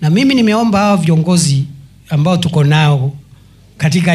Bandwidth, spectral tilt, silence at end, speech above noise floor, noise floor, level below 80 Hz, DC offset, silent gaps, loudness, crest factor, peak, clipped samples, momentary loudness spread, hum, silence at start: 13 kHz; -6 dB/octave; 0 s; 31 dB; -42 dBFS; -46 dBFS; under 0.1%; none; -12 LUFS; 12 dB; 0 dBFS; under 0.1%; 8 LU; none; 0 s